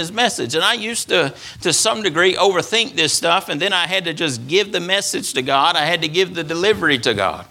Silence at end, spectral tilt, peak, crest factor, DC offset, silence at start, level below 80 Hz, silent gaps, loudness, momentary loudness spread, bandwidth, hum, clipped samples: 0.05 s; -2.5 dB/octave; 0 dBFS; 18 dB; under 0.1%; 0 s; -56 dBFS; none; -17 LUFS; 5 LU; 16.5 kHz; none; under 0.1%